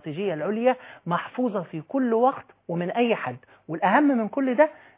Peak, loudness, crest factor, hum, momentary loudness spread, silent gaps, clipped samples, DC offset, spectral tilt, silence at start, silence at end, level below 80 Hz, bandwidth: -6 dBFS; -25 LUFS; 18 dB; none; 12 LU; none; under 0.1%; under 0.1%; -10.5 dB/octave; 0.05 s; 0.2 s; -76 dBFS; 4 kHz